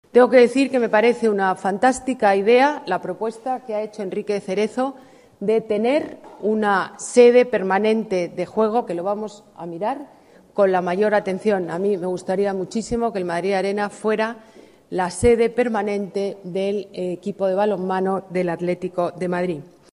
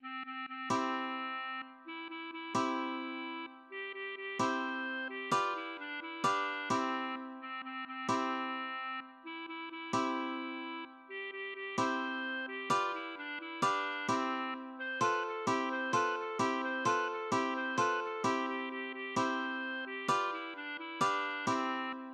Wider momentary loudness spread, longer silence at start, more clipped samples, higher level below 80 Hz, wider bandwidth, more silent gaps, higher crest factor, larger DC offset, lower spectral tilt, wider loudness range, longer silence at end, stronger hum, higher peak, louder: about the same, 12 LU vs 10 LU; first, 0.15 s vs 0 s; neither; first, -52 dBFS vs -84 dBFS; about the same, 11.5 kHz vs 12 kHz; neither; about the same, 18 dB vs 18 dB; neither; first, -5.5 dB/octave vs -3.5 dB/octave; about the same, 5 LU vs 5 LU; first, 0.35 s vs 0 s; neither; first, -2 dBFS vs -18 dBFS; first, -20 LUFS vs -36 LUFS